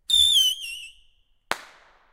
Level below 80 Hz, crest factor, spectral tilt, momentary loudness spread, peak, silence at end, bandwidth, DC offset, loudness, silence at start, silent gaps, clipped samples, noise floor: -54 dBFS; 24 dB; 2 dB/octave; 18 LU; 0 dBFS; 0.5 s; 16 kHz; under 0.1%; -18 LUFS; 0.1 s; none; under 0.1%; -61 dBFS